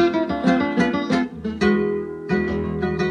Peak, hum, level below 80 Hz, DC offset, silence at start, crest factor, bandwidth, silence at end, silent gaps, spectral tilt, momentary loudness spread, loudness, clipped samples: -6 dBFS; none; -44 dBFS; under 0.1%; 0 s; 16 dB; 9.8 kHz; 0 s; none; -7 dB/octave; 5 LU; -21 LUFS; under 0.1%